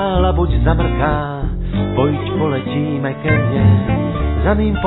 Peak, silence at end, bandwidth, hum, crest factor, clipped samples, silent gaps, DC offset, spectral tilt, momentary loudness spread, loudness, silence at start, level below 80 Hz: -2 dBFS; 0 s; 4.1 kHz; none; 14 dB; under 0.1%; none; under 0.1%; -11.5 dB/octave; 7 LU; -17 LUFS; 0 s; -22 dBFS